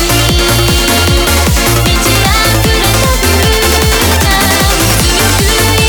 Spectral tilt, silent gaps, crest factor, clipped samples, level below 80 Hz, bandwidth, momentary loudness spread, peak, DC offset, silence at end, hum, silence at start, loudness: -3.5 dB/octave; none; 8 dB; under 0.1%; -16 dBFS; over 20 kHz; 1 LU; 0 dBFS; under 0.1%; 0 s; none; 0 s; -8 LUFS